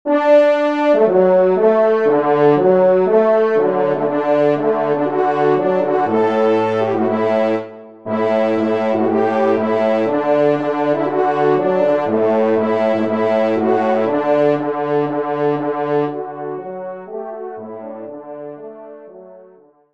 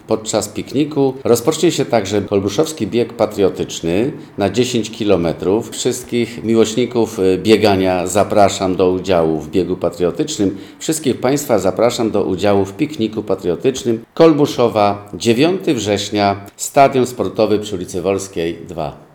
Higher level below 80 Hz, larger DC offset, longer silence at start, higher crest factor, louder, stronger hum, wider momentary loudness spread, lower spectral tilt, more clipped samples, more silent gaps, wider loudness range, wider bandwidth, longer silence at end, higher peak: second, -66 dBFS vs -50 dBFS; first, 0.4% vs under 0.1%; about the same, 0.05 s vs 0.1 s; about the same, 14 dB vs 16 dB; about the same, -16 LUFS vs -16 LUFS; neither; first, 16 LU vs 8 LU; first, -8 dB/octave vs -5 dB/octave; neither; neither; first, 9 LU vs 3 LU; second, 7.4 kHz vs 19.5 kHz; first, 0.5 s vs 0.15 s; about the same, -2 dBFS vs 0 dBFS